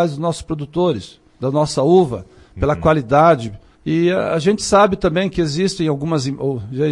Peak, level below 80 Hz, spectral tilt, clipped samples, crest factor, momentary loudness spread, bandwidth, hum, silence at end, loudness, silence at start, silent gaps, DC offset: -2 dBFS; -40 dBFS; -6 dB/octave; under 0.1%; 14 dB; 10 LU; 11.5 kHz; none; 0 s; -17 LUFS; 0 s; none; under 0.1%